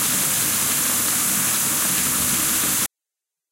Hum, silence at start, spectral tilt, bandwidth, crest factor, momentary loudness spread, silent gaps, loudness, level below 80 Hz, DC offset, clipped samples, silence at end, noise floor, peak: none; 0 s; -0.5 dB/octave; 16 kHz; 14 dB; 1 LU; none; -18 LUFS; -52 dBFS; under 0.1%; under 0.1%; 0.65 s; -86 dBFS; -8 dBFS